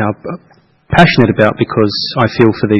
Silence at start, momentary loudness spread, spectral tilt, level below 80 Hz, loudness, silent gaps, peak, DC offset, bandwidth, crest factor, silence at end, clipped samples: 0 s; 15 LU; -7.5 dB/octave; -38 dBFS; -11 LUFS; none; 0 dBFS; under 0.1%; 10 kHz; 12 dB; 0 s; 0.7%